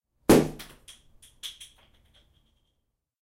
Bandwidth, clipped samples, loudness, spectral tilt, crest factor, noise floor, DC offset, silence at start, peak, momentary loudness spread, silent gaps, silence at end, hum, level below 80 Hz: 16 kHz; under 0.1%; -22 LUFS; -5 dB/octave; 22 dB; -79 dBFS; under 0.1%; 0.3 s; -8 dBFS; 25 LU; none; 1.7 s; none; -52 dBFS